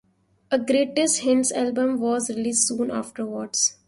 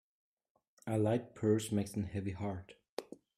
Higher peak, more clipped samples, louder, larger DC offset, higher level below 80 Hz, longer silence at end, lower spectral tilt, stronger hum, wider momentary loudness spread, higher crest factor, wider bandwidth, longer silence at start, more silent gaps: first, -8 dBFS vs -18 dBFS; neither; first, -23 LUFS vs -36 LUFS; neither; about the same, -66 dBFS vs -68 dBFS; about the same, 0.15 s vs 0.25 s; second, -2.5 dB/octave vs -7 dB/octave; neither; second, 7 LU vs 14 LU; about the same, 16 dB vs 18 dB; second, 11.5 kHz vs 14.5 kHz; second, 0.5 s vs 0.85 s; second, none vs 2.89-2.97 s